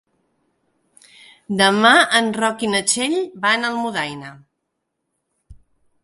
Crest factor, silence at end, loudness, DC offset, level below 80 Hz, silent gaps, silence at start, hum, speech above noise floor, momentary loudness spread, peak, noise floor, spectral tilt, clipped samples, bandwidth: 20 dB; 0.5 s; -17 LUFS; under 0.1%; -60 dBFS; none; 1.5 s; none; 58 dB; 15 LU; 0 dBFS; -76 dBFS; -2.5 dB/octave; under 0.1%; 12 kHz